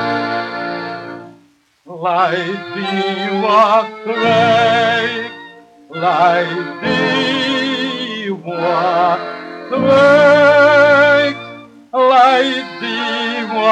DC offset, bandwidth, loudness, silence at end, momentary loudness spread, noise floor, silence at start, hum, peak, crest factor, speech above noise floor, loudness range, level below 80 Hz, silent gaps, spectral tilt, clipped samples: under 0.1%; 9.2 kHz; -14 LUFS; 0 s; 15 LU; -52 dBFS; 0 s; none; 0 dBFS; 14 dB; 39 dB; 6 LU; -62 dBFS; none; -5 dB/octave; under 0.1%